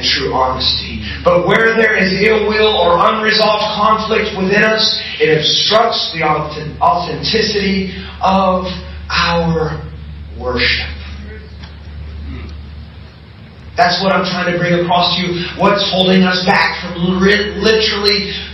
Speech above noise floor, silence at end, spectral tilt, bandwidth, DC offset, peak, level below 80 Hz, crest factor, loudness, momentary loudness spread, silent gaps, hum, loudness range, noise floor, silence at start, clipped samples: 23 dB; 0 s; -5 dB/octave; 9 kHz; under 0.1%; 0 dBFS; -32 dBFS; 14 dB; -13 LUFS; 18 LU; none; none; 9 LU; -36 dBFS; 0 s; under 0.1%